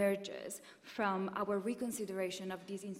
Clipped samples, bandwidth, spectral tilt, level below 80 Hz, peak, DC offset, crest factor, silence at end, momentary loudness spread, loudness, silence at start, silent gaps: under 0.1%; 16 kHz; -4.5 dB/octave; -80 dBFS; -22 dBFS; under 0.1%; 18 dB; 0 s; 10 LU; -39 LUFS; 0 s; none